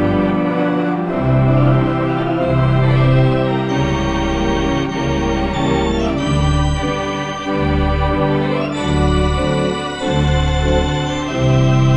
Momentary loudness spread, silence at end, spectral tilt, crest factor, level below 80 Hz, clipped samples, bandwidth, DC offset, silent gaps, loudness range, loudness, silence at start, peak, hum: 6 LU; 0 s; -7 dB/octave; 14 dB; -24 dBFS; under 0.1%; 8.4 kHz; under 0.1%; none; 2 LU; -16 LUFS; 0 s; -2 dBFS; none